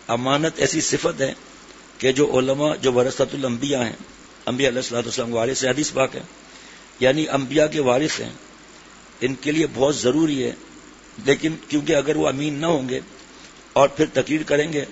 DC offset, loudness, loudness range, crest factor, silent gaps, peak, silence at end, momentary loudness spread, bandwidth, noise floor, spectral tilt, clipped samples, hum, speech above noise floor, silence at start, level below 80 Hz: under 0.1%; -21 LUFS; 2 LU; 20 dB; none; -2 dBFS; 0 s; 13 LU; 8 kHz; -45 dBFS; -4 dB/octave; under 0.1%; none; 24 dB; 0.05 s; -54 dBFS